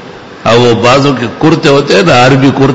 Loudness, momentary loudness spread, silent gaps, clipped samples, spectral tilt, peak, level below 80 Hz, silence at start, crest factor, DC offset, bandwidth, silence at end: -6 LUFS; 5 LU; none; 1%; -5.5 dB/octave; 0 dBFS; -38 dBFS; 0 s; 6 dB; under 0.1%; 11 kHz; 0 s